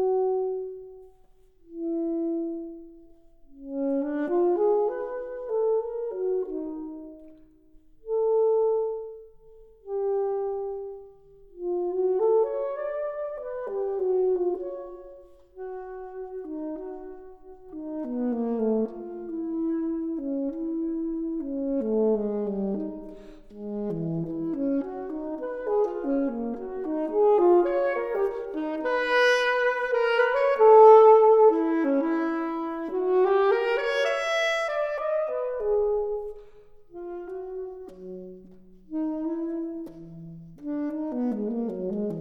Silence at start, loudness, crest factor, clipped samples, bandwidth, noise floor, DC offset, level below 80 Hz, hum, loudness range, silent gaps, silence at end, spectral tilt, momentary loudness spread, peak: 0 s; -25 LUFS; 20 dB; under 0.1%; 7.8 kHz; -56 dBFS; under 0.1%; -56 dBFS; none; 15 LU; none; 0 s; -6 dB/octave; 18 LU; -6 dBFS